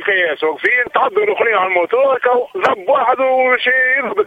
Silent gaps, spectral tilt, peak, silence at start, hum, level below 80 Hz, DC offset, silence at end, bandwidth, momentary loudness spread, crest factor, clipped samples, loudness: none; -4.5 dB/octave; 0 dBFS; 0 s; none; -62 dBFS; under 0.1%; 0 s; 7.6 kHz; 4 LU; 14 dB; under 0.1%; -14 LUFS